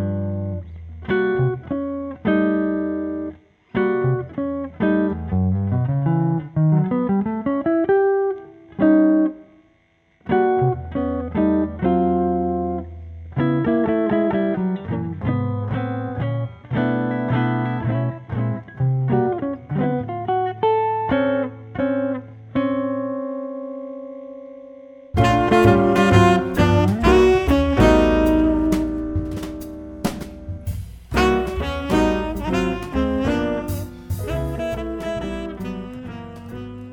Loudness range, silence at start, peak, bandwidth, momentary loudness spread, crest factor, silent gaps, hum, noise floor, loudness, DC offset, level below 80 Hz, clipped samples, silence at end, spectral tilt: 8 LU; 0 s; -2 dBFS; 16.5 kHz; 16 LU; 18 dB; none; none; -60 dBFS; -21 LUFS; under 0.1%; -34 dBFS; under 0.1%; 0 s; -7.5 dB/octave